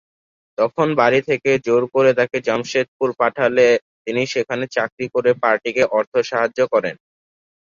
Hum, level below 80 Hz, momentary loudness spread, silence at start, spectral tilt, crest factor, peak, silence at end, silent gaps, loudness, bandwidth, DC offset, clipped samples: none; -62 dBFS; 7 LU; 0.6 s; -5 dB/octave; 16 dB; -2 dBFS; 0.8 s; 2.88-3.00 s, 3.82-4.05 s, 4.92-4.97 s, 6.07-6.12 s; -18 LUFS; 7.4 kHz; under 0.1%; under 0.1%